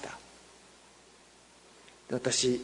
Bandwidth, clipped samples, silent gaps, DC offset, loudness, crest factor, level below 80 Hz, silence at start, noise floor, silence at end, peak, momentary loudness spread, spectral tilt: 11 kHz; under 0.1%; none; under 0.1%; -31 LUFS; 20 dB; -68 dBFS; 0 s; -59 dBFS; 0 s; -16 dBFS; 29 LU; -3 dB/octave